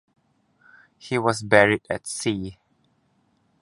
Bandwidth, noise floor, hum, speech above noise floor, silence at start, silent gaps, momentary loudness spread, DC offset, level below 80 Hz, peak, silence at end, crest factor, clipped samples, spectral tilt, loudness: 11.5 kHz; -66 dBFS; none; 44 dB; 1.05 s; none; 13 LU; under 0.1%; -56 dBFS; 0 dBFS; 1.1 s; 26 dB; under 0.1%; -4.5 dB/octave; -22 LUFS